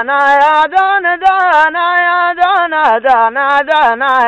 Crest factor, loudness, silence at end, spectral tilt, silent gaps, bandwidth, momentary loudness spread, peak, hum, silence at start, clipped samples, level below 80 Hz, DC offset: 8 dB; -10 LUFS; 0 s; -2.5 dB/octave; none; 8.8 kHz; 3 LU; -2 dBFS; none; 0 s; under 0.1%; -50 dBFS; under 0.1%